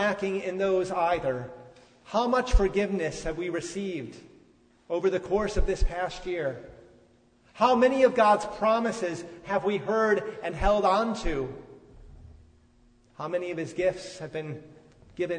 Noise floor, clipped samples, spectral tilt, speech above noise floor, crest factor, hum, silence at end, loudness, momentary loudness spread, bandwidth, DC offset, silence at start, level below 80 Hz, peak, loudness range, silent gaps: -61 dBFS; under 0.1%; -5.5 dB/octave; 35 dB; 20 dB; none; 0 s; -27 LUFS; 14 LU; 9.6 kHz; under 0.1%; 0 s; -36 dBFS; -8 dBFS; 9 LU; none